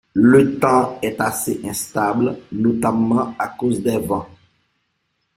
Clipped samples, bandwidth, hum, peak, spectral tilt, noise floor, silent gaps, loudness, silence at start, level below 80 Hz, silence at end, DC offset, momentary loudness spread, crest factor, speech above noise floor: under 0.1%; 16.5 kHz; none; -2 dBFS; -6 dB/octave; -70 dBFS; none; -18 LUFS; 0.15 s; -54 dBFS; 1.1 s; under 0.1%; 11 LU; 18 dB; 53 dB